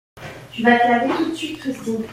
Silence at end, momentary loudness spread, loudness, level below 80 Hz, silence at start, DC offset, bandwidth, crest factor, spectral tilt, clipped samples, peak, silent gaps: 0 s; 19 LU; -19 LUFS; -56 dBFS; 0.15 s; under 0.1%; 15.5 kHz; 18 dB; -5 dB/octave; under 0.1%; -2 dBFS; none